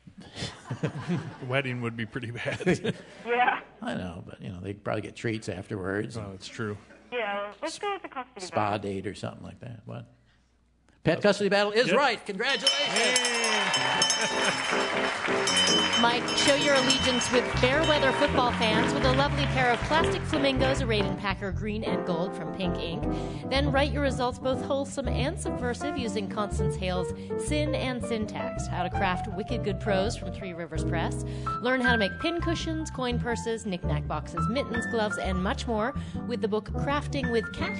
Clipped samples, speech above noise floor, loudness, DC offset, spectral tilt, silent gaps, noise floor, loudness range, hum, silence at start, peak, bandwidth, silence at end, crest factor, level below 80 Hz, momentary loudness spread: under 0.1%; 37 dB; -27 LUFS; under 0.1%; -4 dB/octave; none; -65 dBFS; 10 LU; none; 0.2 s; -8 dBFS; 11 kHz; 0 s; 20 dB; -42 dBFS; 13 LU